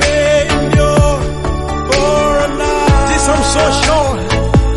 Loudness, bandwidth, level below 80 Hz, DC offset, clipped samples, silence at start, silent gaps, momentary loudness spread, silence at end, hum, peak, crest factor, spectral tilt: -12 LUFS; 11.5 kHz; -18 dBFS; under 0.1%; under 0.1%; 0 s; none; 6 LU; 0 s; none; 0 dBFS; 12 dB; -4.5 dB/octave